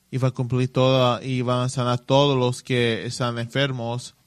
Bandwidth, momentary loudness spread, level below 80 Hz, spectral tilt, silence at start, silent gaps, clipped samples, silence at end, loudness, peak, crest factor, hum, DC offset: 12 kHz; 7 LU; -58 dBFS; -6 dB/octave; 0.1 s; none; under 0.1%; 0.15 s; -22 LUFS; -4 dBFS; 18 dB; none; under 0.1%